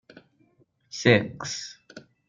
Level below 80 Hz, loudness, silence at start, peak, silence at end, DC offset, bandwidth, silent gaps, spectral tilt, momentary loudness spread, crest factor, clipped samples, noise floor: -62 dBFS; -24 LUFS; 0.95 s; -4 dBFS; 0.3 s; under 0.1%; 7.6 kHz; none; -4.5 dB/octave; 20 LU; 24 dB; under 0.1%; -64 dBFS